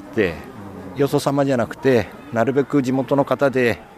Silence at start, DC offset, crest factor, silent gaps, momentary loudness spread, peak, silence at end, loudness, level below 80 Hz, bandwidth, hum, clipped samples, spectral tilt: 0 s; under 0.1%; 16 dB; none; 12 LU; -4 dBFS; 0.05 s; -20 LUFS; -52 dBFS; 15 kHz; none; under 0.1%; -6.5 dB/octave